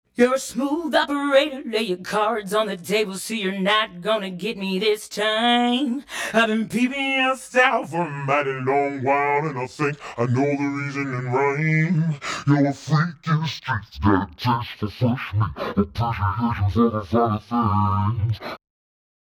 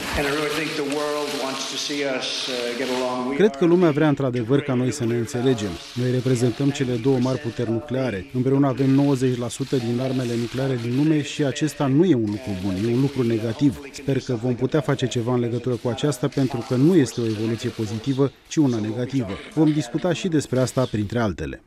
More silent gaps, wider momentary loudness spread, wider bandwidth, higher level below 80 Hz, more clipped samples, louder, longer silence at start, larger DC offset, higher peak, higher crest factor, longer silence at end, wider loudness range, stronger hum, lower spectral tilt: neither; about the same, 7 LU vs 7 LU; first, 16.5 kHz vs 14.5 kHz; about the same, -48 dBFS vs -50 dBFS; neither; about the same, -22 LUFS vs -22 LUFS; first, 0.2 s vs 0 s; neither; about the same, -4 dBFS vs -6 dBFS; about the same, 18 dB vs 16 dB; first, 0.8 s vs 0.1 s; about the same, 2 LU vs 2 LU; neither; about the same, -5.5 dB/octave vs -6 dB/octave